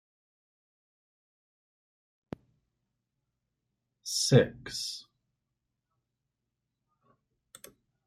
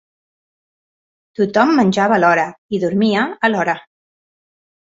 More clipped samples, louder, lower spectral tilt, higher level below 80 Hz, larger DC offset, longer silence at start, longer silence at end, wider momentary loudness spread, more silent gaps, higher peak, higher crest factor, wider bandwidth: neither; second, -28 LUFS vs -16 LUFS; second, -4.5 dB/octave vs -6 dB/octave; second, -68 dBFS vs -60 dBFS; neither; first, 4.05 s vs 1.4 s; first, 3.05 s vs 1.05 s; first, 24 LU vs 8 LU; second, none vs 2.58-2.69 s; second, -8 dBFS vs -2 dBFS; first, 30 dB vs 16 dB; first, 15.5 kHz vs 7.8 kHz